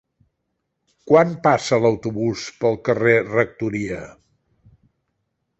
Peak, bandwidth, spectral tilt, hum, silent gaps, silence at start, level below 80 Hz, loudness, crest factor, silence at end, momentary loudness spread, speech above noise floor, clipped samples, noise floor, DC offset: -2 dBFS; 8.2 kHz; -6 dB/octave; none; none; 1.05 s; -56 dBFS; -19 LUFS; 20 dB; 1.5 s; 9 LU; 56 dB; under 0.1%; -75 dBFS; under 0.1%